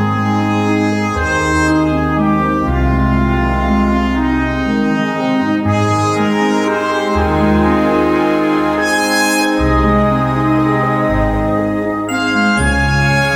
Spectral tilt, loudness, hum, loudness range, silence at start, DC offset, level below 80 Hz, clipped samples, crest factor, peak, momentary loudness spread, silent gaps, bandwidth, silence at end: -6 dB/octave; -14 LUFS; none; 2 LU; 0 s; under 0.1%; -24 dBFS; under 0.1%; 12 dB; -2 dBFS; 3 LU; none; 16 kHz; 0 s